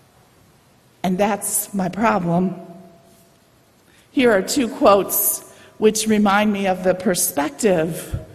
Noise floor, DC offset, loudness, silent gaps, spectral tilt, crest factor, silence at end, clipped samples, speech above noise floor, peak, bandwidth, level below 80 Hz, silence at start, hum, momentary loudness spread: -55 dBFS; under 0.1%; -19 LUFS; none; -4.5 dB/octave; 20 dB; 0 s; under 0.1%; 36 dB; 0 dBFS; 14.5 kHz; -48 dBFS; 1.05 s; none; 10 LU